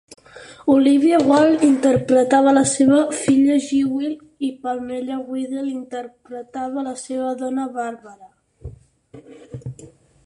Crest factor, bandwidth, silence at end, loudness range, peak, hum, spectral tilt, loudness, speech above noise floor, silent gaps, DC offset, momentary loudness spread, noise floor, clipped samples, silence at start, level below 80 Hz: 16 dB; 11.5 kHz; 0.4 s; 13 LU; -4 dBFS; none; -5 dB/octave; -18 LUFS; 24 dB; none; under 0.1%; 18 LU; -42 dBFS; under 0.1%; 0.35 s; -54 dBFS